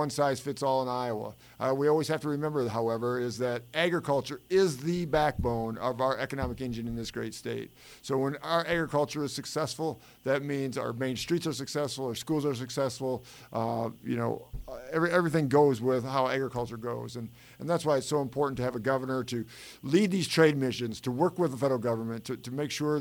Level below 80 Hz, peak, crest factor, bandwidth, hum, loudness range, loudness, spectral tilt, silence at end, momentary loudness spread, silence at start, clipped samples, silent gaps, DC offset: -54 dBFS; -10 dBFS; 20 dB; over 20 kHz; none; 4 LU; -30 LUFS; -5.5 dB/octave; 0 s; 10 LU; 0 s; under 0.1%; none; under 0.1%